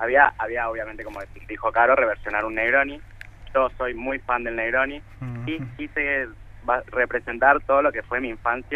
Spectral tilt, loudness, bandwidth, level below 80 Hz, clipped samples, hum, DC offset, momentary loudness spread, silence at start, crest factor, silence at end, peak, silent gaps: -7 dB/octave; -23 LUFS; 6 kHz; -44 dBFS; under 0.1%; none; under 0.1%; 16 LU; 0 s; 22 dB; 0 s; -2 dBFS; none